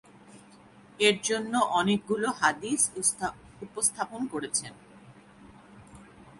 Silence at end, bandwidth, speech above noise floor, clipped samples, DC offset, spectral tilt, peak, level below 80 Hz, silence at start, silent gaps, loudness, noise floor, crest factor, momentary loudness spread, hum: 0 s; 12 kHz; 26 dB; under 0.1%; under 0.1%; -2.5 dB/octave; -8 dBFS; -64 dBFS; 0.3 s; none; -27 LUFS; -54 dBFS; 22 dB; 11 LU; none